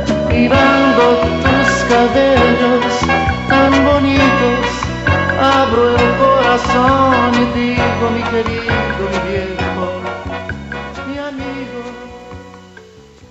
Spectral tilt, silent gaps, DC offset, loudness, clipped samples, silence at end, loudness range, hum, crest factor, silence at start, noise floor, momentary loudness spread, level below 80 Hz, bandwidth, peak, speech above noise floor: -5.5 dB/octave; none; under 0.1%; -13 LUFS; under 0.1%; 0.5 s; 11 LU; none; 12 dB; 0 s; -40 dBFS; 14 LU; -30 dBFS; 8.2 kHz; -2 dBFS; 26 dB